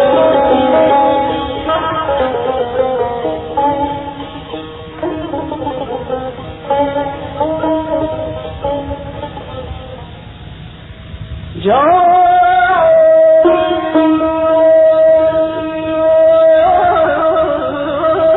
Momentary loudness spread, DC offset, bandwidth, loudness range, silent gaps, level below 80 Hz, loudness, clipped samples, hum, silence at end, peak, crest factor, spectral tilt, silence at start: 19 LU; under 0.1%; 4.1 kHz; 11 LU; none; -36 dBFS; -12 LUFS; under 0.1%; none; 0 s; 0 dBFS; 12 dB; -4 dB/octave; 0 s